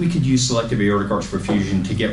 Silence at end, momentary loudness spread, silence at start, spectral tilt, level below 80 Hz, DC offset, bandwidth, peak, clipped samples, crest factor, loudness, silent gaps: 0 s; 4 LU; 0 s; -5.5 dB/octave; -38 dBFS; under 0.1%; 11.5 kHz; -6 dBFS; under 0.1%; 12 dB; -19 LUFS; none